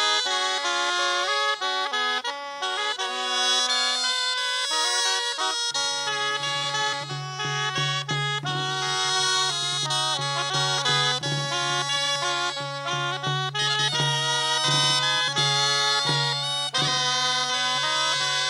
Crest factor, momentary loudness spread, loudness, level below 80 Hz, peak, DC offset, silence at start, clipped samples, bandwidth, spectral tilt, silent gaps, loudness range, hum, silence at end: 16 dB; 6 LU; -23 LUFS; -74 dBFS; -8 dBFS; under 0.1%; 0 s; under 0.1%; 16.5 kHz; -1.5 dB/octave; none; 3 LU; none; 0 s